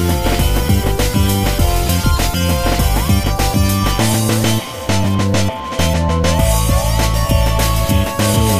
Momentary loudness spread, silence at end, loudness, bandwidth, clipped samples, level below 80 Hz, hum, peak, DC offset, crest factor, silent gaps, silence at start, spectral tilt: 2 LU; 0 s; -15 LUFS; 15.5 kHz; under 0.1%; -20 dBFS; none; 0 dBFS; under 0.1%; 14 dB; none; 0 s; -5 dB/octave